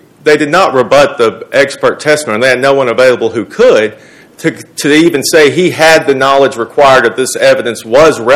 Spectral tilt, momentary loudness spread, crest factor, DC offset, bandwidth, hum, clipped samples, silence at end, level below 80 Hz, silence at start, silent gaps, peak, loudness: -4 dB/octave; 7 LU; 8 dB; under 0.1%; 17 kHz; none; 6%; 0 s; -44 dBFS; 0.25 s; none; 0 dBFS; -8 LUFS